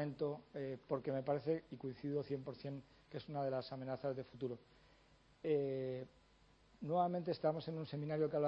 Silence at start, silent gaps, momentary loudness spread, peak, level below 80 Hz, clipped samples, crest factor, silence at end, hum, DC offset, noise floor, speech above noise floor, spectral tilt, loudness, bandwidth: 0 s; none; 11 LU; -24 dBFS; -74 dBFS; under 0.1%; 18 dB; 0 s; none; under 0.1%; -70 dBFS; 28 dB; -9.5 dB/octave; -42 LUFS; 5.8 kHz